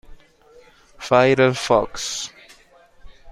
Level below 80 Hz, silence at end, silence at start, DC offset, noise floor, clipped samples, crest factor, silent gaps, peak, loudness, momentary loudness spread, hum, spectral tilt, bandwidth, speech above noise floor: -48 dBFS; 0 s; 0.1 s; under 0.1%; -52 dBFS; under 0.1%; 20 dB; none; -2 dBFS; -19 LUFS; 16 LU; none; -4.5 dB/octave; 14.5 kHz; 34 dB